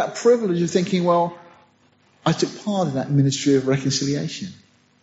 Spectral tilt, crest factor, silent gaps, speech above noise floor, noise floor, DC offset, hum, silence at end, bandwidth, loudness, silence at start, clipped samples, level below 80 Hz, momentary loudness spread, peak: -6 dB/octave; 16 dB; none; 38 dB; -59 dBFS; under 0.1%; none; 0.5 s; 8 kHz; -21 LUFS; 0 s; under 0.1%; -62 dBFS; 8 LU; -6 dBFS